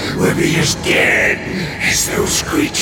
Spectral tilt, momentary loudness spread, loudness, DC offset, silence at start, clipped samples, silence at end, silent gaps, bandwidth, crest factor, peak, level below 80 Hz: -3 dB/octave; 5 LU; -14 LUFS; under 0.1%; 0 s; under 0.1%; 0 s; none; 17.5 kHz; 14 dB; -2 dBFS; -36 dBFS